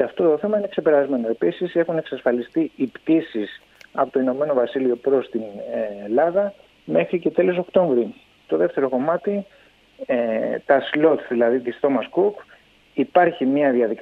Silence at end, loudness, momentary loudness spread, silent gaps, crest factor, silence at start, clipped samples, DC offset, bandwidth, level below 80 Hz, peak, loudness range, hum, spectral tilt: 0 s; -21 LUFS; 9 LU; none; 18 dB; 0 s; under 0.1%; under 0.1%; 5.4 kHz; -66 dBFS; -2 dBFS; 2 LU; none; -8.5 dB/octave